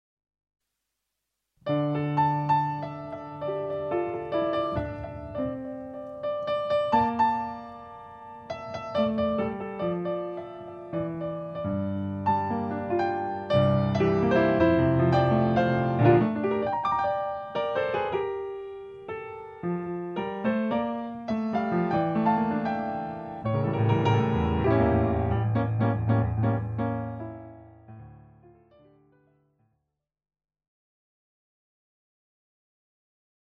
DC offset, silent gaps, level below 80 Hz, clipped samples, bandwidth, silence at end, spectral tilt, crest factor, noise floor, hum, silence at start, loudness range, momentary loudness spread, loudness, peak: under 0.1%; none; -48 dBFS; under 0.1%; 6.6 kHz; 5.4 s; -9 dB/octave; 20 dB; -83 dBFS; none; 1.65 s; 8 LU; 15 LU; -27 LUFS; -8 dBFS